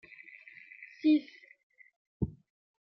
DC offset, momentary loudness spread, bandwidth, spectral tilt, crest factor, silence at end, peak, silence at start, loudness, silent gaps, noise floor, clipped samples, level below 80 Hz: under 0.1%; 23 LU; 5.8 kHz; -7 dB/octave; 18 dB; 0.55 s; -16 dBFS; 0.8 s; -32 LUFS; 1.63-1.70 s, 1.96-2.20 s; -54 dBFS; under 0.1%; -58 dBFS